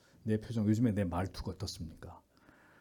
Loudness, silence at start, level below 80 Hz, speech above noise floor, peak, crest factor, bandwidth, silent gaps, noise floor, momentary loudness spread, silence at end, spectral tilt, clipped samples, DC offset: -35 LUFS; 0.25 s; -56 dBFS; 29 dB; -18 dBFS; 18 dB; 17.5 kHz; none; -63 dBFS; 17 LU; 0.6 s; -7 dB/octave; under 0.1%; under 0.1%